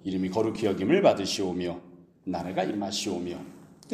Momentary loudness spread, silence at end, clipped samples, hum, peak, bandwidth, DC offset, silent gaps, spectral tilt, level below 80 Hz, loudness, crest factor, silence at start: 18 LU; 0 s; under 0.1%; none; -6 dBFS; 15.5 kHz; under 0.1%; none; -5 dB/octave; -62 dBFS; -28 LUFS; 22 dB; 0.05 s